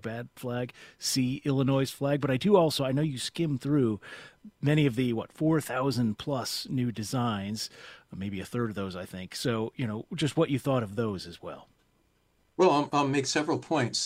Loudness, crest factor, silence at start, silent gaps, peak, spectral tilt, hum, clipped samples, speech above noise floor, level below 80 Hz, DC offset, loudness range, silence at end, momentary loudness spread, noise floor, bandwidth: -29 LUFS; 20 dB; 0.05 s; none; -10 dBFS; -5.5 dB/octave; none; under 0.1%; 40 dB; -62 dBFS; under 0.1%; 6 LU; 0 s; 14 LU; -69 dBFS; 16 kHz